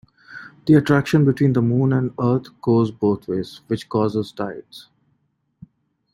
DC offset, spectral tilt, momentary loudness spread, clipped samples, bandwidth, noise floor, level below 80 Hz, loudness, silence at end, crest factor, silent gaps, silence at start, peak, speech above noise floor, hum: under 0.1%; -8.5 dB/octave; 14 LU; under 0.1%; 12.5 kHz; -68 dBFS; -56 dBFS; -20 LUFS; 1.35 s; 18 dB; none; 0.3 s; -2 dBFS; 49 dB; none